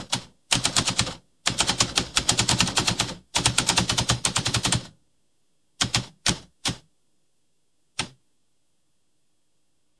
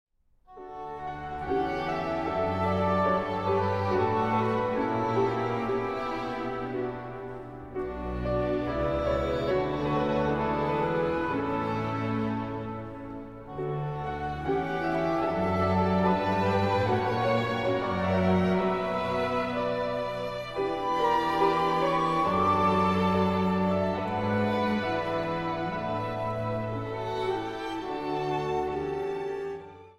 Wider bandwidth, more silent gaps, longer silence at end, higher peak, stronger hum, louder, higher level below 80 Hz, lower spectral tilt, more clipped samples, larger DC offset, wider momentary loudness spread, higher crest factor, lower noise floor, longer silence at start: about the same, 12 kHz vs 12.5 kHz; neither; first, 1.9 s vs 0.05 s; first, 0 dBFS vs -12 dBFS; neither; first, -23 LUFS vs -28 LUFS; about the same, -46 dBFS vs -48 dBFS; second, -2 dB/octave vs -7.5 dB/octave; neither; first, 0.1% vs under 0.1%; about the same, 10 LU vs 10 LU; first, 28 dB vs 16 dB; first, -75 dBFS vs -56 dBFS; second, 0 s vs 0.5 s